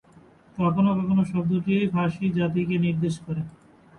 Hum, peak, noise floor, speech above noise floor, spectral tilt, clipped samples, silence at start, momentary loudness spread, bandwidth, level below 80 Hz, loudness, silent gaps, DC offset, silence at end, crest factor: none; -10 dBFS; -53 dBFS; 30 dB; -8.5 dB/octave; under 0.1%; 0.55 s; 10 LU; 10.5 kHz; -56 dBFS; -24 LUFS; none; under 0.1%; 0.45 s; 14 dB